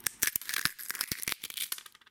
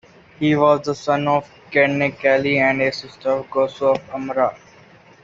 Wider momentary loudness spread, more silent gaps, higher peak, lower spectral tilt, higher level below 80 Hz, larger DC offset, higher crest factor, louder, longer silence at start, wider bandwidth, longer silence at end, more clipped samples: about the same, 6 LU vs 7 LU; neither; second, -6 dBFS vs -2 dBFS; second, 0.5 dB/octave vs -6 dB/octave; second, -64 dBFS vs -58 dBFS; neither; first, 30 dB vs 16 dB; second, -33 LUFS vs -19 LUFS; second, 0 s vs 0.4 s; first, 17.5 kHz vs 7.6 kHz; second, 0.2 s vs 0.7 s; neither